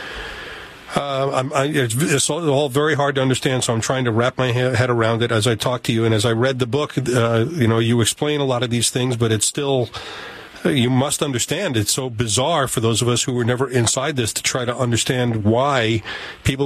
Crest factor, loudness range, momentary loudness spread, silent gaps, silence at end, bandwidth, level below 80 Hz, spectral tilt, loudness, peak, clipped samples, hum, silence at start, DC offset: 16 dB; 1 LU; 6 LU; none; 0 s; 15 kHz; -48 dBFS; -4.5 dB/octave; -19 LUFS; -2 dBFS; under 0.1%; none; 0 s; under 0.1%